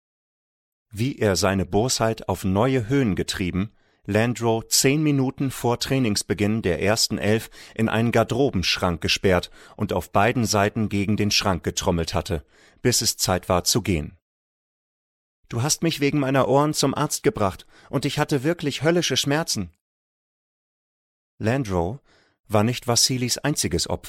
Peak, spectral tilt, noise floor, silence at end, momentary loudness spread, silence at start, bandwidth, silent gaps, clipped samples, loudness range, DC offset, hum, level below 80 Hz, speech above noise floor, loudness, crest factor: -6 dBFS; -4 dB/octave; under -90 dBFS; 0 s; 8 LU; 0.95 s; 16.5 kHz; 14.22-15.43 s, 19.81-21.38 s, 22.40-22.44 s; under 0.1%; 3 LU; under 0.1%; none; -46 dBFS; over 68 dB; -22 LUFS; 18 dB